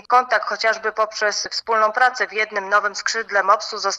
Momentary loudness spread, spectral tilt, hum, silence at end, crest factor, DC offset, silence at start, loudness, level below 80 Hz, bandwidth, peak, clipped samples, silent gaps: 5 LU; 0 dB/octave; none; 0 s; 18 dB; under 0.1%; 0.1 s; -19 LUFS; -68 dBFS; 11 kHz; -2 dBFS; under 0.1%; none